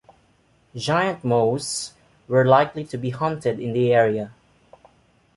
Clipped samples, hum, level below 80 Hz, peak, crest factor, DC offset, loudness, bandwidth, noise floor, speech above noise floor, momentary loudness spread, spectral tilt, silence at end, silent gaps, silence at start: under 0.1%; none; -60 dBFS; -2 dBFS; 20 dB; under 0.1%; -21 LUFS; 11.5 kHz; -60 dBFS; 40 dB; 12 LU; -5.5 dB/octave; 1.05 s; none; 0.75 s